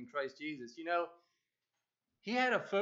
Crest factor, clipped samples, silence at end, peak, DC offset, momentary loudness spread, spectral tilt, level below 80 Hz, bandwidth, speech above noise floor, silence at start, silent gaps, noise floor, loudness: 20 dB; under 0.1%; 0 s; -18 dBFS; under 0.1%; 13 LU; -4.5 dB/octave; under -90 dBFS; 7.8 kHz; 53 dB; 0 s; none; -90 dBFS; -37 LUFS